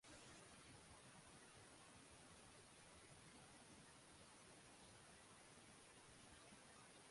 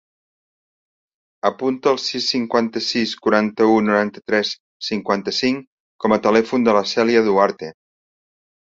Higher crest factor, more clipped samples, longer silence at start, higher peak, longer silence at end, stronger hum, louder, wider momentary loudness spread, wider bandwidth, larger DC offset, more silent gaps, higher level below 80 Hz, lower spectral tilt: about the same, 14 dB vs 18 dB; neither; second, 0 s vs 1.45 s; second, -52 dBFS vs -2 dBFS; second, 0 s vs 0.95 s; neither; second, -64 LUFS vs -19 LUFS; second, 2 LU vs 9 LU; first, 11.5 kHz vs 7.8 kHz; neither; second, none vs 4.60-4.80 s, 5.67-5.99 s; second, -80 dBFS vs -60 dBFS; second, -2.5 dB/octave vs -4.5 dB/octave